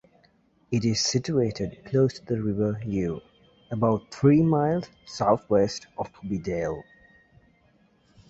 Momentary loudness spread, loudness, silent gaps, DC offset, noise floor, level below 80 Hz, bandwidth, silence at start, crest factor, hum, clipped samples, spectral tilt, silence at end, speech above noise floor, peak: 13 LU; -26 LUFS; none; under 0.1%; -63 dBFS; -52 dBFS; 8 kHz; 0.7 s; 20 dB; none; under 0.1%; -6 dB/octave; 1.45 s; 38 dB; -6 dBFS